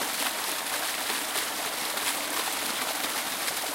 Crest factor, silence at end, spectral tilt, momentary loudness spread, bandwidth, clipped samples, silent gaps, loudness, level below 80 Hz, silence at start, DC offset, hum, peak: 20 dB; 0 s; 0.5 dB/octave; 1 LU; 17 kHz; under 0.1%; none; -28 LUFS; -68 dBFS; 0 s; under 0.1%; none; -12 dBFS